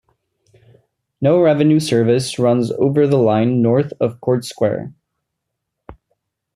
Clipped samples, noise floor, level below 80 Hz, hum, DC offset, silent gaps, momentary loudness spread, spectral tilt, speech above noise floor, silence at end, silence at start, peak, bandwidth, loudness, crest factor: under 0.1%; -77 dBFS; -56 dBFS; none; under 0.1%; none; 7 LU; -7 dB/octave; 62 dB; 0.6 s; 1.2 s; -2 dBFS; 14.5 kHz; -16 LUFS; 14 dB